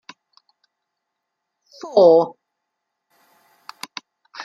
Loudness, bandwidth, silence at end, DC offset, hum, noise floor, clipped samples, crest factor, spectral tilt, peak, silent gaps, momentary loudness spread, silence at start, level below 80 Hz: -15 LUFS; 13.5 kHz; 0 s; under 0.1%; none; -79 dBFS; under 0.1%; 20 dB; -5.5 dB/octave; -2 dBFS; none; 26 LU; 1.85 s; -76 dBFS